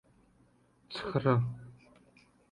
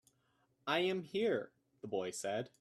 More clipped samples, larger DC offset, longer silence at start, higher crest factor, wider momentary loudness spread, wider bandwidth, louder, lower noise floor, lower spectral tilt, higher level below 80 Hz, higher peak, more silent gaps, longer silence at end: neither; neither; first, 0.9 s vs 0.65 s; about the same, 22 dB vs 20 dB; first, 20 LU vs 13 LU; second, 9.8 kHz vs 14 kHz; first, -32 LUFS vs -38 LUFS; second, -67 dBFS vs -77 dBFS; first, -8 dB/octave vs -4 dB/octave; first, -64 dBFS vs -84 dBFS; first, -14 dBFS vs -20 dBFS; neither; first, 0.75 s vs 0.15 s